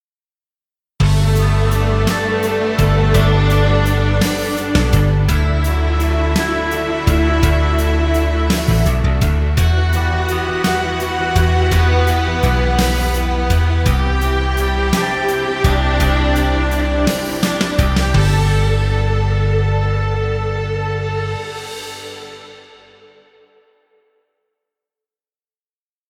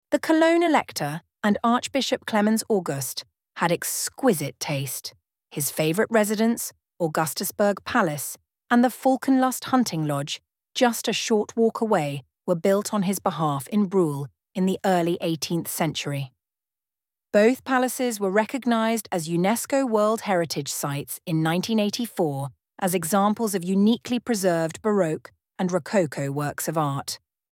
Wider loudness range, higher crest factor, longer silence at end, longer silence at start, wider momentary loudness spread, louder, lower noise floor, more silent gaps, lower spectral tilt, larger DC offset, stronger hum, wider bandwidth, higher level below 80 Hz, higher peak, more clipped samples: first, 6 LU vs 2 LU; about the same, 14 dB vs 18 dB; first, 3.5 s vs 0.35 s; first, 1 s vs 0.1 s; second, 6 LU vs 10 LU; first, -16 LUFS vs -24 LUFS; about the same, under -90 dBFS vs under -90 dBFS; neither; first, -6 dB/octave vs -4.5 dB/octave; neither; neither; about the same, 18 kHz vs 17.5 kHz; first, -20 dBFS vs -68 dBFS; first, 0 dBFS vs -6 dBFS; neither